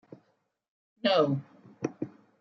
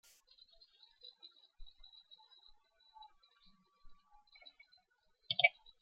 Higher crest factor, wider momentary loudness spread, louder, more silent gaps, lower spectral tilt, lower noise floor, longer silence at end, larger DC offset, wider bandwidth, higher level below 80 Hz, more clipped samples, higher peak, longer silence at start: second, 22 dB vs 32 dB; second, 16 LU vs 29 LU; first, -29 LUFS vs -33 LUFS; neither; first, -6.5 dB/octave vs 3 dB/octave; about the same, -74 dBFS vs -77 dBFS; about the same, 0.35 s vs 0.3 s; neither; about the same, 7 kHz vs 7.2 kHz; second, -80 dBFS vs -68 dBFS; neither; about the same, -12 dBFS vs -14 dBFS; second, 1.05 s vs 1.6 s